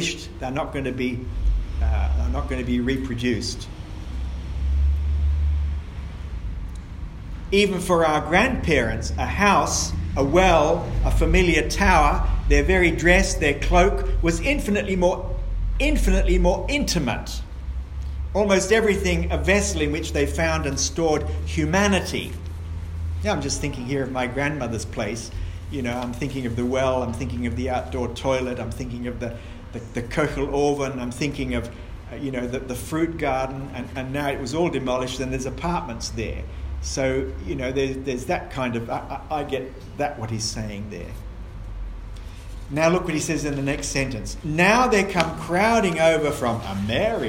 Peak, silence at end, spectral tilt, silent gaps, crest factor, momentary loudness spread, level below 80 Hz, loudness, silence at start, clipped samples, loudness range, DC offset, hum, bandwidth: -2 dBFS; 0 s; -5 dB/octave; none; 22 dB; 15 LU; -28 dBFS; -23 LUFS; 0 s; under 0.1%; 8 LU; under 0.1%; none; 16 kHz